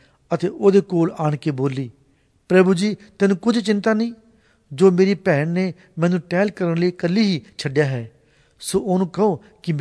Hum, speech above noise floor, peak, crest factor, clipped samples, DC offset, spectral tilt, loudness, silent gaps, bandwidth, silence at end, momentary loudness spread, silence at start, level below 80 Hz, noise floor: none; 40 dB; -2 dBFS; 16 dB; under 0.1%; under 0.1%; -6.5 dB/octave; -20 LUFS; none; 11 kHz; 0 s; 11 LU; 0.3 s; -60 dBFS; -59 dBFS